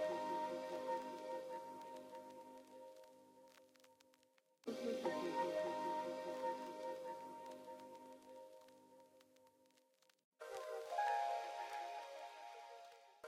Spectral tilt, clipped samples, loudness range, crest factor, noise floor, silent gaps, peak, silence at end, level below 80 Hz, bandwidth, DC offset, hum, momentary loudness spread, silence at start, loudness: -4 dB/octave; under 0.1%; 12 LU; 18 dB; -76 dBFS; 10.24-10.32 s; -30 dBFS; 0 s; under -90 dBFS; 16 kHz; under 0.1%; none; 21 LU; 0 s; -46 LUFS